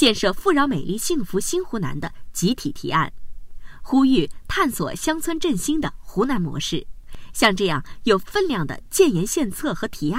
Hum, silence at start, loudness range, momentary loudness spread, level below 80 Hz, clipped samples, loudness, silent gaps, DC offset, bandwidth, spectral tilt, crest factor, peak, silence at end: none; 0 s; 3 LU; 9 LU; -38 dBFS; under 0.1%; -22 LUFS; none; under 0.1%; 16 kHz; -4 dB/octave; 18 dB; -2 dBFS; 0 s